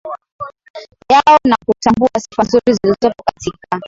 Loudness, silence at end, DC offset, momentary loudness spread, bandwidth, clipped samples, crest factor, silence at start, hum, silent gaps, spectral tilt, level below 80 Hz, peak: -13 LUFS; 0 s; under 0.1%; 20 LU; 7.8 kHz; under 0.1%; 14 dB; 0.05 s; none; 0.32-0.39 s, 0.70-0.74 s; -5 dB/octave; -46 dBFS; 0 dBFS